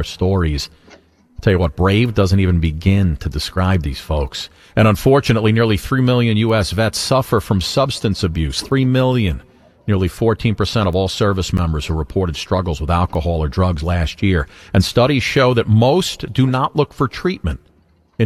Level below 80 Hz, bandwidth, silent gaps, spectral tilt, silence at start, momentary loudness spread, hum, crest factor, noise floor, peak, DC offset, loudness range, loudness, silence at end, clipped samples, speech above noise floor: -32 dBFS; 14 kHz; none; -6 dB/octave; 0 s; 7 LU; none; 16 dB; -55 dBFS; 0 dBFS; under 0.1%; 3 LU; -17 LUFS; 0 s; under 0.1%; 39 dB